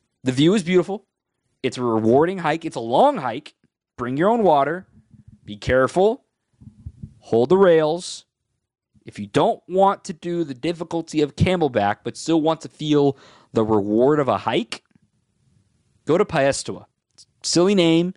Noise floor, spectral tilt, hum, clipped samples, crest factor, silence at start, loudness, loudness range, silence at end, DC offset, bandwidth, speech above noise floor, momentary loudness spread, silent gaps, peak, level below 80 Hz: -74 dBFS; -5.5 dB/octave; none; under 0.1%; 16 dB; 0.25 s; -20 LUFS; 3 LU; 0.05 s; under 0.1%; 11.5 kHz; 55 dB; 16 LU; none; -4 dBFS; -50 dBFS